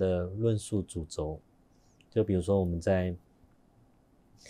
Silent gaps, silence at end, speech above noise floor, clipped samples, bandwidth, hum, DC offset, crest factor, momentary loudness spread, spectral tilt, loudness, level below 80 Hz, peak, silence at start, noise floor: none; 0 s; 34 dB; under 0.1%; 12 kHz; none; under 0.1%; 18 dB; 10 LU; -7 dB/octave; -31 LUFS; -52 dBFS; -16 dBFS; 0 s; -64 dBFS